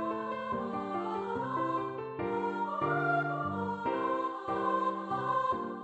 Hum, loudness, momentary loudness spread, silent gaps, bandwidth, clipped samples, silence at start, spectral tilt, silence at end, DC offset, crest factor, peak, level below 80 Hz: none; -33 LUFS; 5 LU; none; 8.4 kHz; under 0.1%; 0 s; -7.5 dB/octave; 0 s; under 0.1%; 14 dB; -18 dBFS; -68 dBFS